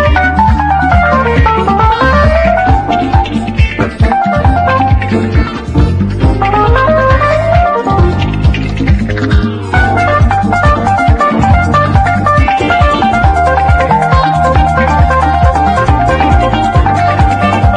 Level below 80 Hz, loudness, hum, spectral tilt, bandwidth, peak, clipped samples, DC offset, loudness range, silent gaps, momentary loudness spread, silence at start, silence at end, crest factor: -16 dBFS; -9 LUFS; none; -7.5 dB/octave; 9.8 kHz; 0 dBFS; 0.2%; under 0.1%; 2 LU; none; 3 LU; 0 s; 0 s; 8 dB